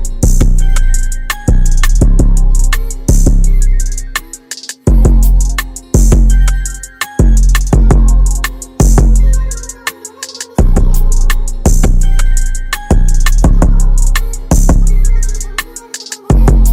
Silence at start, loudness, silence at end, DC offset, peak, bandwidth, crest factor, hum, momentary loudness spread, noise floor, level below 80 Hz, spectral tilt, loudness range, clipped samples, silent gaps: 0 s; -13 LUFS; 0 s; under 0.1%; 0 dBFS; 16 kHz; 8 dB; none; 11 LU; -28 dBFS; -8 dBFS; -5 dB/octave; 2 LU; under 0.1%; none